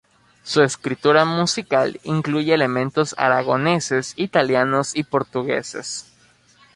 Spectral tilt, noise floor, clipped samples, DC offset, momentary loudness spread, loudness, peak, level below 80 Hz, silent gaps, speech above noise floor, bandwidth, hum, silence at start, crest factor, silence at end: -4.5 dB/octave; -55 dBFS; under 0.1%; under 0.1%; 7 LU; -20 LUFS; -2 dBFS; -60 dBFS; none; 35 dB; 11.5 kHz; none; 0.45 s; 18 dB; 0.75 s